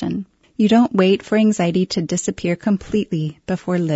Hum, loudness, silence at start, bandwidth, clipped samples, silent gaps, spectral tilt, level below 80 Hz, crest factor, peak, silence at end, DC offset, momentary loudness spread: none; -19 LUFS; 0 s; 8 kHz; under 0.1%; none; -6 dB/octave; -50 dBFS; 16 dB; -2 dBFS; 0 s; under 0.1%; 10 LU